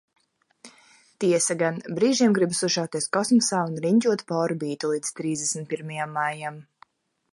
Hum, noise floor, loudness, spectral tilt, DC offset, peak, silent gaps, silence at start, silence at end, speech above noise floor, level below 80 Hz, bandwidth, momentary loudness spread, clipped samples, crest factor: none; -58 dBFS; -24 LUFS; -4 dB/octave; under 0.1%; -10 dBFS; none; 0.65 s; 0.7 s; 34 dB; -72 dBFS; 11.5 kHz; 9 LU; under 0.1%; 16 dB